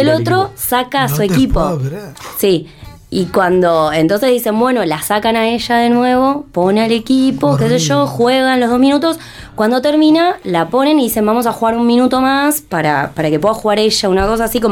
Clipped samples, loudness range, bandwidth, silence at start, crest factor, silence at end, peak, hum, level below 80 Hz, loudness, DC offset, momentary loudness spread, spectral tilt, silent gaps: under 0.1%; 2 LU; 18 kHz; 0 s; 10 dB; 0 s; -2 dBFS; none; -34 dBFS; -13 LUFS; under 0.1%; 5 LU; -5 dB/octave; none